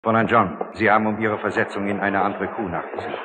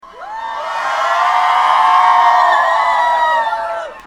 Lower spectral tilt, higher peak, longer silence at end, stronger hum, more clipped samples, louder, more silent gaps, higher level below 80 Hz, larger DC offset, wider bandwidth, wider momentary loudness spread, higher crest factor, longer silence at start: first, -7.5 dB/octave vs 0 dB/octave; second, -4 dBFS vs 0 dBFS; about the same, 0 s vs 0 s; neither; neither; second, -21 LUFS vs -13 LUFS; neither; second, -60 dBFS vs -54 dBFS; neither; second, 9.2 kHz vs 13.5 kHz; second, 10 LU vs 13 LU; about the same, 18 dB vs 14 dB; about the same, 0.05 s vs 0.05 s